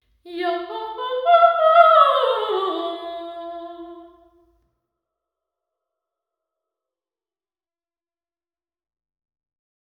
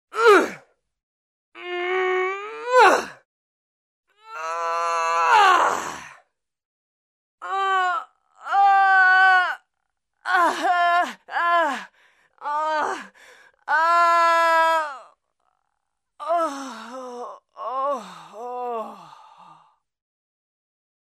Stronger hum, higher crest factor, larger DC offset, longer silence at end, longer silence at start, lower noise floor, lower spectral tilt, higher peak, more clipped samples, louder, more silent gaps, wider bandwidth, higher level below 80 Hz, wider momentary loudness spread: neither; about the same, 22 dB vs 20 dB; neither; first, 5.85 s vs 2.15 s; about the same, 0.25 s vs 0.15 s; first, under -90 dBFS vs -80 dBFS; first, -3.5 dB/octave vs -1.5 dB/octave; about the same, 0 dBFS vs -2 dBFS; neither; first, -17 LUFS vs -20 LUFS; second, none vs 1.03-1.52 s, 3.25-4.03 s, 6.65-7.38 s; second, 5.2 kHz vs 15.5 kHz; first, -70 dBFS vs -76 dBFS; about the same, 22 LU vs 20 LU